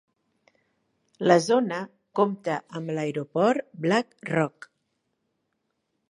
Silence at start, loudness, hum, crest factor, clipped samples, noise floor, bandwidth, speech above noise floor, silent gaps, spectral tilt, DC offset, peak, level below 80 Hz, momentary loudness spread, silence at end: 1.2 s; -26 LUFS; none; 24 dB; under 0.1%; -77 dBFS; 11.5 kHz; 53 dB; none; -6 dB/octave; under 0.1%; -4 dBFS; -74 dBFS; 10 LU; 1.65 s